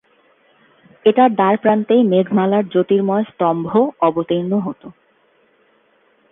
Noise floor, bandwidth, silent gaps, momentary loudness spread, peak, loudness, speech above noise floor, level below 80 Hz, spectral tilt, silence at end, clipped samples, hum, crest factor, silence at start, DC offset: -57 dBFS; 3.9 kHz; none; 7 LU; 0 dBFS; -16 LUFS; 42 dB; -62 dBFS; -10.5 dB/octave; 1.4 s; under 0.1%; none; 16 dB; 1.05 s; under 0.1%